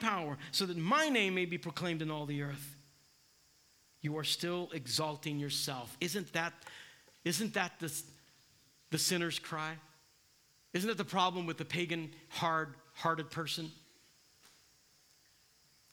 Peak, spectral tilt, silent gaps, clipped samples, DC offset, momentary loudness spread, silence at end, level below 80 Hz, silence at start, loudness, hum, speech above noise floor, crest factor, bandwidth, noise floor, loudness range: -16 dBFS; -3.5 dB/octave; none; under 0.1%; under 0.1%; 12 LU; 2.15 s; -80 dBFS; 0 s; -36 LUFS; none; 32 dB; 22 dB; 19 kHz; -69 dBFS; 4 LU